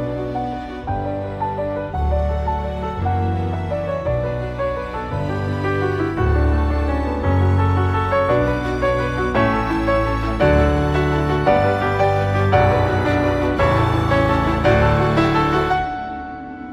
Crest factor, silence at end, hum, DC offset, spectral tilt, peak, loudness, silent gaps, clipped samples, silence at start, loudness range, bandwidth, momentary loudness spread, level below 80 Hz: 16 dB; 0 s; none; under 0.1%; -8 dB/octave; -2 dBFS; -19 LUFS; none; under 0.1%; 0 s; 6 LU; 11 kHz; 8 LU; -28 dBFS